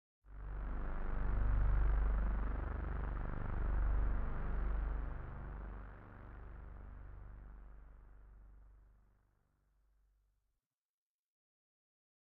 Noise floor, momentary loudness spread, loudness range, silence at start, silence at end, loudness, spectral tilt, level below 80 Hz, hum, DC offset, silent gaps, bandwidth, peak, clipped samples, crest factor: -90 dBFS; 22 LU; 19 LU; 0.25 s; 3.45 s; -42 LUFS; -8.5 dB/octave; -40 dBFS; none; under 0.1%; none; 3.2 kHz; -24 dBFS; under 0.1%; 16 dB